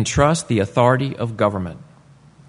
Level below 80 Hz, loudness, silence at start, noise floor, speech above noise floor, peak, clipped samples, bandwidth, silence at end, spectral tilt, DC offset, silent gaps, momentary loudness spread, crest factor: -42 dBFS; -19 LUFS; 0 s; -48 dBFS; 30 dB; 0 dBFS; under 0.1%; 11 kHz; 0.65 s; -5.5 dB/octave; under 0.1%; none; 10 LU; 18 dB